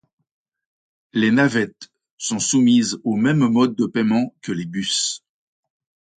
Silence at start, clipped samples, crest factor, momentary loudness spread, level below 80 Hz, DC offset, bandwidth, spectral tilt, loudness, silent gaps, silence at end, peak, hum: 1.15 s; under 0.1%; 18 dB; 11 LU; -62 dBFS; under 0.1%; 9.4 kHz; -4 dB/octave; -19 LUFS; 2.11-2.18 s; 1 s; -4 dBFS; none